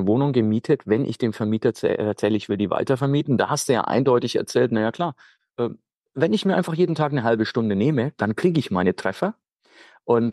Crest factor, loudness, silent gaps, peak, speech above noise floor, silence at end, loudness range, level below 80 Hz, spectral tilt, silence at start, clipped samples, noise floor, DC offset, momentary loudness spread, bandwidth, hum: 14 dB; -22 LUFS; 5.97-6.01 s, 9.53-9.57 s; -6 dBFS; 32 dB; 0 s; 2 LU; -64 dBFS; -6.5 dB/octave; 0 s; under 0.1%; -53 dBFS; under 0.1%; 8 LU; 12.5 kHz; none